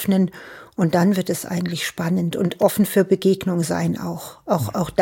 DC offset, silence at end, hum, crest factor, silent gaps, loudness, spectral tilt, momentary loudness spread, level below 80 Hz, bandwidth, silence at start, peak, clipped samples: under 0.1%; 0 s; none; 18 dB; none; -21 LUFS; -6 dB/octave; 8 LU; -56 dBFS; 17 kHz; 0 s; -2 dBFS; under 0.1%